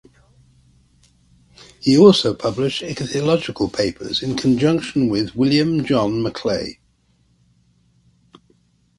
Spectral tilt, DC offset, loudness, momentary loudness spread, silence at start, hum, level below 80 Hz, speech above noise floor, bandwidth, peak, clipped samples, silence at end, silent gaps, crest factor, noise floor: -6 dB/octave; under 0.1%; -18 LUFS; 11 LU; 1.85 s; none; -50 dBFS; 43 dB; 11.5 kHz; 0 dBFS; under 0.1%; 2.25 s; none; 20 dB; -60 dBFS